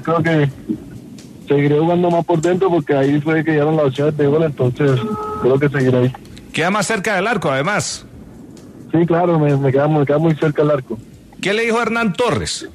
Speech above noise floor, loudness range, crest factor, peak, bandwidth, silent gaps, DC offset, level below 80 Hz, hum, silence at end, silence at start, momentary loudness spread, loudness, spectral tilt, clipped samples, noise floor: 22 dB; 2 LU; 14 dB; -2 dBFS; 13.5 kHz; none; under 0.1%; -48 dBFS; none; 0 s; 0 s; 10 LU; -16 LUFS; -6 dB/octave; under 0.1%; -37 dBFS